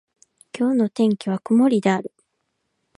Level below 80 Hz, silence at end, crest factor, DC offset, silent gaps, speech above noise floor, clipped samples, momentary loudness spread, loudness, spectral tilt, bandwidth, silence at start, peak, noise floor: -72 dBFS; 0.9 s; 16 dB; under 0.1%; none; 55 dB; under 0.1%; 11 LU; -20 LUFS; -7 dB/octave; 11.5 kHz; 0.55 s; -4 dBFS; -74 dBFS